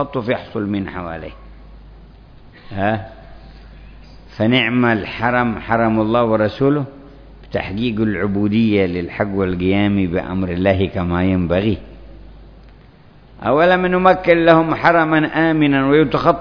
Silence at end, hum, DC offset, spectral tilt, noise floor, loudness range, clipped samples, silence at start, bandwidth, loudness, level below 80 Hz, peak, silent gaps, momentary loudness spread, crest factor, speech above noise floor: 0 s; none; under 0.1%; -9 dB/octave; -44 dBFS; 10 LU; under 0.1%; 0 s; 5.4 kHz; -17 LUFS; -40 dBFS; 0 dBFS; none; 11 LU; 18 dB; 28 dB